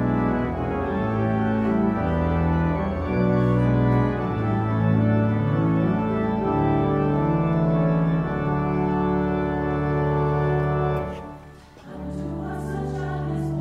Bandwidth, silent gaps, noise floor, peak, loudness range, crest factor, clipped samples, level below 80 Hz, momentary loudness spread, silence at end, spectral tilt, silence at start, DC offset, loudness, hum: 6.8 kHz; none; -44 dBFS; -10 dBFS; 4 LU; 14 dB; under 0.1%; -36 dBFS; 9 LU; 0 s; -10 dB/octave; 0 s; under 0.1%; -23 LUFS; none